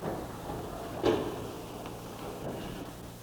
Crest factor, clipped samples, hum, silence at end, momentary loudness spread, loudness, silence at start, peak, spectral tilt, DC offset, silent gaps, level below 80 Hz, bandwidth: 22 dB; under 0.1%; none; 0 s; 12 LU; -37 LUFS; 0 s; -14 dBFS; -5.5 dB/octave; under 0.1%; none; -52 dBFS; over 20 kHz